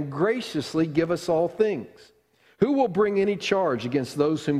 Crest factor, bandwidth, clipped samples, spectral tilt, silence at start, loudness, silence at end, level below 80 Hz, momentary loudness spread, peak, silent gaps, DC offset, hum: 18 dB; 14 kHz; under 0.1%; -6 dB/octave; 0 s; -24 LUFS; 0 s; -62 dBFS; 5 LU; -8 dBFS; none; under 0.1%; none